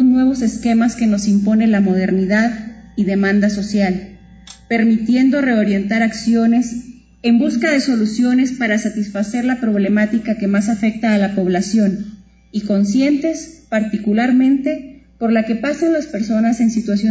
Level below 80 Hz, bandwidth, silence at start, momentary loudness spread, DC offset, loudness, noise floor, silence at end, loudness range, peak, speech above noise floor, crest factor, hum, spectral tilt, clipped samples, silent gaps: -48 dBFS; 8 kHz; 0 s; 8 LU; under 0.1%; -16 LUFS; -40 dBFS; 0 s; 2 LU; -4 dBFS; 25 dB; 12 dB; none; -6 dB/octave; under 0.1%; none